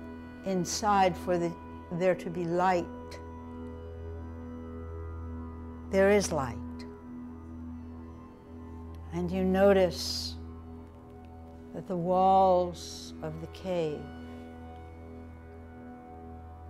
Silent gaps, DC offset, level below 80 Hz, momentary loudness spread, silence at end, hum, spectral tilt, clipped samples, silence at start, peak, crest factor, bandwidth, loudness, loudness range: none; under 0.1%; -50 dBFS; 23 LU; 0 s; none; -5.5 dB/octave; under 0.1%; 0 s; -12 dBFS; 18 dB; 15.5 kHz; -29 LUFS; 9 LU